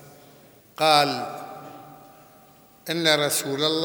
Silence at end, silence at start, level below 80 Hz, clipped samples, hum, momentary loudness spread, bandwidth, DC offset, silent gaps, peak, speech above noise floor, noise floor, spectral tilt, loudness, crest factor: 0 s; 0.05 s; -74 dBFS; under 0.1%; none; 23 LU; over 20 kHz; under 0.1%; none; -2 dBFS; 31 dB; -53 dBFS; -2.5 dB/octave; -22 LUFS; 24 dB